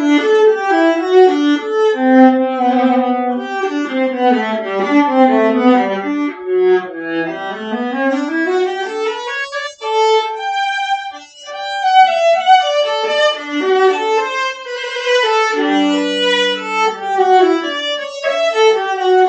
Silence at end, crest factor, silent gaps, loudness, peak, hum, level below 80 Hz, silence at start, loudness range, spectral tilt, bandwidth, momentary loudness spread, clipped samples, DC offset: 0 s; 14 dB; none; -14 LUFS; 0 dBFS; none; -68 dBFS; 0 s; 5 LU; -3.5 dB/octave; 8.6 kHz; 10 LU; under 0.1%; under 0.1%